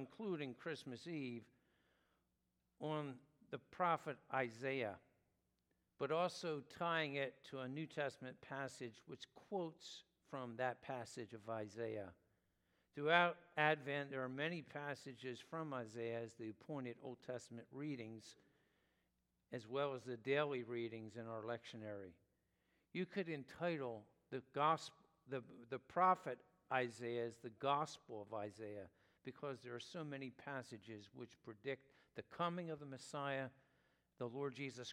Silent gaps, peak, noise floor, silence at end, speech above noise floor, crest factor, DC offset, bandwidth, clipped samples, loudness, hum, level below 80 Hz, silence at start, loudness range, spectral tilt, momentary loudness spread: none; -18 dBFS; -86 dBFS; 0 s; 41 dB; 28 dB; under 0.1%; 15.5 kHz; under 0.1%; -45 LUFS; none; -88 dBFS; 0 s; 9 LU; -5.5 dB/octave; 15 LU